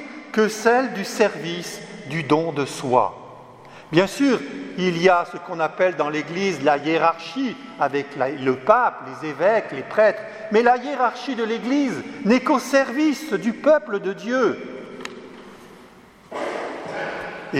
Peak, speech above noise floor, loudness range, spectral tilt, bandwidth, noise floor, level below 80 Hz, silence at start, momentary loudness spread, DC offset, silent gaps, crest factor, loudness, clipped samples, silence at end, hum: 0 dBFS; 27 dB; 4 LU; -5 dB/octave; 16 kHz; -47 dBFS; -66 dBFS; 0 s; 14 LU; under 0.1%; none; 22 dB; -21 LUFS; under 0.1%; 0 s; none